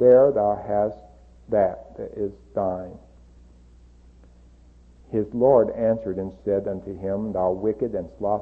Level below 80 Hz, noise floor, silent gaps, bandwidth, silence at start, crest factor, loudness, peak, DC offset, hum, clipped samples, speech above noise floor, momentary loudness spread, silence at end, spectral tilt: -50 dBFS; -51 dBFS; none; 2.8 kHz; 0 s; 18 dB; -24 LUFS; -6 dBFS; under 0.1%; 60 Hz at -50 dBFS; under 0.1%; 29 dB; 13 LU; 0 s; -10.5 dB/octave